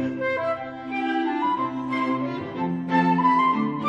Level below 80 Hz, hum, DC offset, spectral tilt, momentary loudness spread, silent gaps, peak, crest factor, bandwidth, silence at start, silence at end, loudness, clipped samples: -64 dBFS; none; under 0.1%; -7.5 dB/octave; 9 LU; none; -8 dBFS; 16 dB; 7.8 kHz; 0 s; 0 s; -24 LUFS; under 0.1%